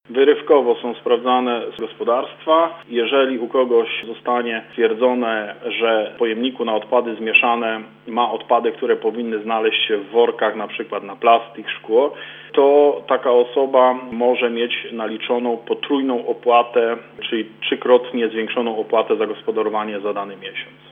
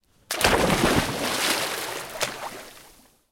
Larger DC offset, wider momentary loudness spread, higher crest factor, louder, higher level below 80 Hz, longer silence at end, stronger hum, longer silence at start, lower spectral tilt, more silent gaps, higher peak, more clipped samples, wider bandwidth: neither; second, 9 LU vs 16 LU; about the same, 18 dB vs 20 dB; first, -19 LUFS vs -23 LUFS; second, -74 dBFS vs -42 dBFS; second, 0.2 s vs 0.45 s; neither; second, 0.1 s vs 0.3 s; first, -7 dB/octave vs -3 dB/octave; neither; first, 0 dBFS vs -6 dBFS; neither; second, 3.8 kHz vs 17 kHz